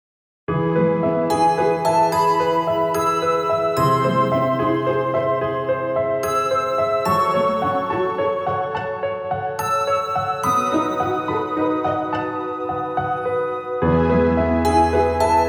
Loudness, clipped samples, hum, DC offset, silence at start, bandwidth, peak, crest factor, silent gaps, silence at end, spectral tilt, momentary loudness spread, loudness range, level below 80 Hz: -20 LUFS; under 0.1%; none; under 0.1%; 0.5 s; 19.5 kHz; -4 dBFS; 14 dB; none; 0 s; -6 dB/octave; 7 LU; 3 LU; -42 dBFS